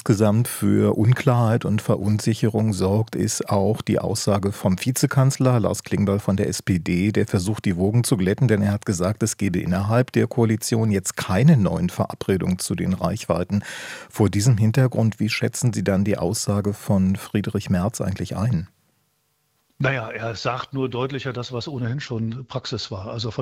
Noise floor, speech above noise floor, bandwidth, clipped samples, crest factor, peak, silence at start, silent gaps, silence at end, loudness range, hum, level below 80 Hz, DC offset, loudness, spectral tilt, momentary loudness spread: -68 dBFS; 48 dB; 16 kHz; under 0.1%; 18 dB; -2 dBFS; 0.05 s; none; 0 s; 6 LU; none; -56 dBFS; under 0.1%; -22 LUFS; -6 dB/octave; 9 LU